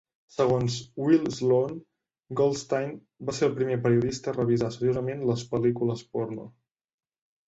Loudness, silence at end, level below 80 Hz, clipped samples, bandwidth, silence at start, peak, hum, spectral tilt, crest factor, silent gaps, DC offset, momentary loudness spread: -27 LUFS; 1 s; -58 dBFS; under 0.1%; 8.2 kHz; 0.4 s; -10 dBFS; none; -6.5 dB/octave; 18 dB; none; under 0.1%; 11 LU